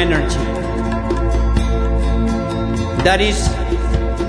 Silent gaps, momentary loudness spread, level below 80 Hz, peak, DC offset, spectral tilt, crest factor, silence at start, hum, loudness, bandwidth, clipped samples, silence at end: none; 5 LU; -20 dBFS; 0 dBFS; under 0.1%; -5.5 dB/octave; 16 dB; 0 s; none; -18 LUFS; 10.5 kHz; under 0.1%; 0 s